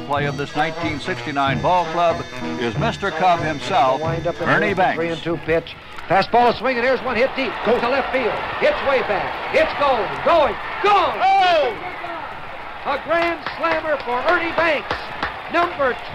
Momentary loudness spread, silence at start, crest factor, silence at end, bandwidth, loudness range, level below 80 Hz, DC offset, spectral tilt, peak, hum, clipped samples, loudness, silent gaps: 9 LU; 0 s; 14 dB; 0 s; 13.5 kHz; 3 LU; -44 dBFS; under 0.1%; -5.5 dB/octave; -6 dBFS; none; under 0.1%; -19 LUFS; none